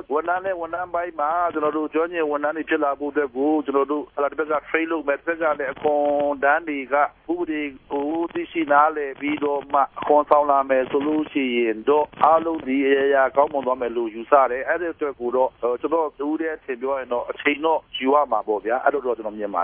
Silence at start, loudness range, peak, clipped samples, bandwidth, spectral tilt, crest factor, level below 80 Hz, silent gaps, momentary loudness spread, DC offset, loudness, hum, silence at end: 0.1 s; 3 LU; -2 dBFS; under 0.1%; 3.8 kHz; -8.5 dB/octave; 20 dB; -60 dBFS; none; 9 LU; under 0.1%; -22 LUFS; none; 0 s